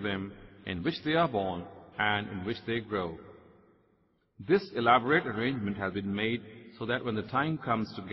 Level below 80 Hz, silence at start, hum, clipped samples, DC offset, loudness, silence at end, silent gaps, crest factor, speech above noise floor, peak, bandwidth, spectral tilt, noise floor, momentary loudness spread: -62 dBFS; 0 s; none; under 0.1%; under 0.1%; -31 LUFS; 0 s; none; 22 dB; 40 dB; -10 dBFS; 6 kHz; -8 dB/octave; -70 dBFS; 15 LU